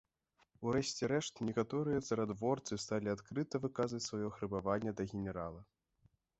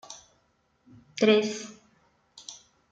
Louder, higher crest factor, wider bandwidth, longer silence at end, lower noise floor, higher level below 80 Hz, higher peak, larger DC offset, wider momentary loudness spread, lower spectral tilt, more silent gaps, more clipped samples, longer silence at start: second, -39 LUFS vs -25 LUFS; about the same, 18 dB vs 22 dB; second, 8 kHz vs 9 kHz; first, 0.75 s vs 0.35 s; first, -77 dBFS vs -70 dBFS; first, -64 dBFS vs -76 dBFS; second, -20 dBFS vs -10 dBFS; neither; second, 5 LU vs 24 LU; first, -5.5 dB/octave vs -4 dB/octave; neither; neither; first, 0.6 s vs 0.1 s